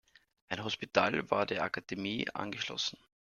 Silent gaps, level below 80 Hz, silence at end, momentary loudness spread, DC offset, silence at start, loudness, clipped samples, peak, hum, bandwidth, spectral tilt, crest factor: none; -70 dBFS; 0.35 s; 7 LU; under 0.1%; 0.5 s; -34 LUFS; under 0.1%; -8 dBFS; none; 12.5 kHz; -4 dB/octave; 28 dB